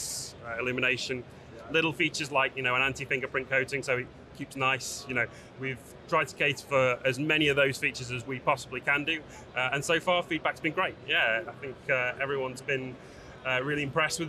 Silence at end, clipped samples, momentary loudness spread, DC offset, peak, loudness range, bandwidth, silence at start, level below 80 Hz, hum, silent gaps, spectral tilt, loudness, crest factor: 0 s; under 0.1%; 12 LU; under 0.1%; -12 dBFS; 3 LU; 13.5 kHz; 0 s; -60 dBFS; none; none; -3.5 dB/octave; -29 LUFS; 18 dB